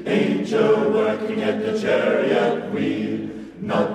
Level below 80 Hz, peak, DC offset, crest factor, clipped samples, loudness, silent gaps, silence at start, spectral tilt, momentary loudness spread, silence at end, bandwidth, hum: -60 dBFS; -6 dBFS; under 0.1%; 14 dB; under 0.1%; -21 LUFS; none; 0 s; -6.5 dB/octave; 8 LU; 0 s; 10 kHz; none